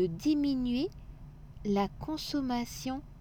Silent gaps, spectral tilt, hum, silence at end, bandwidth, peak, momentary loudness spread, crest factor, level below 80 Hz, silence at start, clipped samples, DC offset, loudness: none; -5.5 dB/octave; none; 0 s; 18.5 kHz; -18 dBFS; 21 LU; 14 dB; -50 dBFS; 0 s; under 0.1%; under 0.1%; -33 LUFS